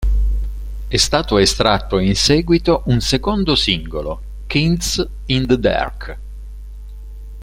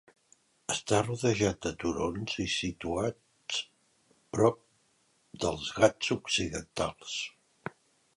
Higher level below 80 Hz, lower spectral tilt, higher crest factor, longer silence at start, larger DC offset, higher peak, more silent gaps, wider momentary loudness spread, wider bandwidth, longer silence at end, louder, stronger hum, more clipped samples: first, -24 dBFS vs -54 dBFS; about the same, -4.5 dB/octave vs -4 dB/octave; second, 18 dB vs 24 dB; second, 0 s vs 0.7 s; neither; first, 0 dBFS vs -8 dBFS; neither; first, 22 LU vs 16 LU; first, 16 kHz vs 11.5 kHz; second, 0 s vs 0.45 s; first, -16 LUFS vs -31 LUFS; first, 50 Hz at -30 dBFS vs none; neither